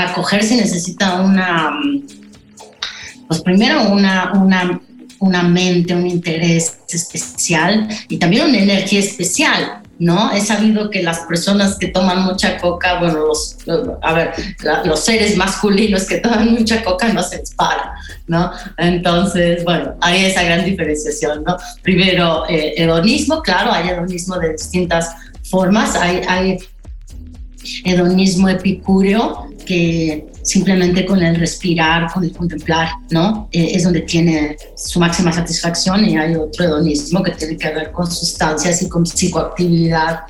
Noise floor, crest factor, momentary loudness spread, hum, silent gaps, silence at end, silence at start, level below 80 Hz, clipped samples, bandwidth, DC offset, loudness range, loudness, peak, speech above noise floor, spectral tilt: -40 dBFS; 12 dB; 8 LU; none; none; 0 s; 0 s; -36 dBFS; under 0.1%; 12.5 kHz; under 0.1%; 2 LU; -15 LUFS; -2 dBFS; 26 dB; -4.5 dB/octave